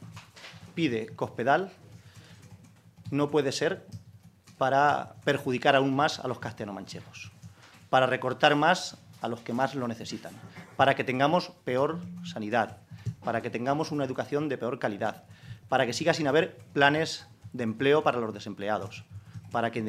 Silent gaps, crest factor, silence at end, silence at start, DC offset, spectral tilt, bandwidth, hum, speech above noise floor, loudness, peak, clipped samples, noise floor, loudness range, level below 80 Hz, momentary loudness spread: none; 24 dB; 0 s; 0 s; under 0.1%; -5 dB/octave; 15 kHz; none; 27 dB; -28 LUFS; -4 dBFS; under 0.1%; -54 dBFS; 4 LU; -70 dBFS; 20 LU